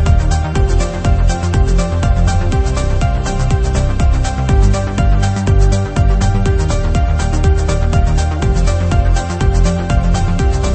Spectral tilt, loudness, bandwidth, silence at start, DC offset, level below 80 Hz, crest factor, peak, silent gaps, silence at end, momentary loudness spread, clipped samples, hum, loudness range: -6.5 dB/octave; -15 LUFS; 8.8 kHz; 0 s; under 0.1%; -14 dBFS; 12 dB; 0 dBFS; none; 0 s; 2 LU; under 0.1%; none; 1 LU